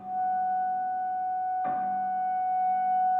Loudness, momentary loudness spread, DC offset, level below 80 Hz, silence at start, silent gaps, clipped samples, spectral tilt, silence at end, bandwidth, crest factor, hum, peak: -29 LUFS; 4 LU; under 0.1%; -78 dBFS; 0 s; none; under 0.1%; -8 dB/octave; 0 s; 3.1 kHz; 8 dB; none; -20 dBFS